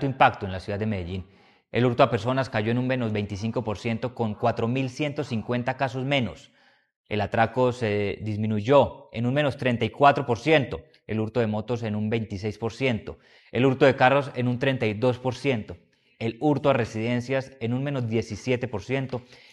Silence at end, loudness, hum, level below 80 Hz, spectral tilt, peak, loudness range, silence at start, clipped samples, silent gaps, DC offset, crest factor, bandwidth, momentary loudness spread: 0.2 s; -25 LUFS; none; -56 dBFS; -7 dB/octave; -2 dBFS; 4 LU; 0 s; under 0.1%; 6.96-7.04 s; under 0.1%; 22 dB; 10 kHz; 11 LU